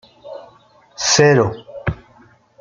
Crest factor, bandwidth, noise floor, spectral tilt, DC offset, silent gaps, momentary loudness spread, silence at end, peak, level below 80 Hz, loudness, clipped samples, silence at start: 20 dB; 9.4 kHz; -50 dBFS; -3.5 dB/octave; under 0.1%; none; 25 LU; 0.65 s; 0 dBFS; -44 dBFS; -16 LUFS; under 0.1%; 0.25 s